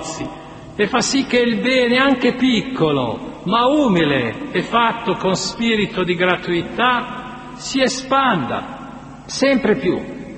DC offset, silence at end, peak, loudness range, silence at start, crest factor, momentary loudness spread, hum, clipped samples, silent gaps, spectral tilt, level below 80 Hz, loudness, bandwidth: under 0.1%; 0 s; 0 dBFS; 3 LU; 0 s; 18 dB; 14 LU; none; under 0.1%; none; -4.5 dB/octave; -48 dBFS; -17 LUFS; 8.8 kHz